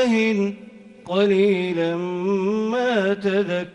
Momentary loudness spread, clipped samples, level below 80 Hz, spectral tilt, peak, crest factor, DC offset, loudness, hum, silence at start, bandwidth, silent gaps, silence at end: 7 LU; under 0.1%; -64 dBFS; -6.5 dB/octave; -8 dBFS; 14 dB; under 0.1%; -21 LUFS; none; 0 s; 10 kHz; none; 0.05 s